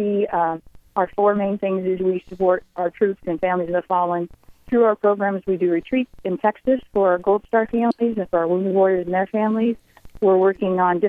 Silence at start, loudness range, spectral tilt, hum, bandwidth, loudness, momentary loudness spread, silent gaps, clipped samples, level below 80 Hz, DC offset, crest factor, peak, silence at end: 0 s; 2 LU; -9.5 dB/octave; none; 4.7 kHz; -21 LUFS; 6 LU; none; under 0.1%; -52 dBFS; under 0.1%; 16 dB; -4 dBFS; 0 s